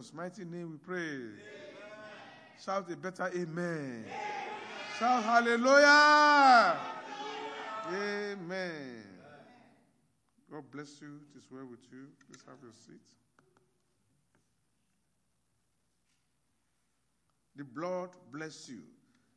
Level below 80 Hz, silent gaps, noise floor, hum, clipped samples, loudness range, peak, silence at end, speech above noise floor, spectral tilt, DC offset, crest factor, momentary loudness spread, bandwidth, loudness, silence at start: -88 dBFS; none; -79 dBFS; none; under 0.1%; 22 LU; -10 dBFS; 0.55 s; 48 dB; -3.5 dB/octave; under 0.1%; 22 dB; 28 LU; 10.5 kHz; -28 LUFS; 0 s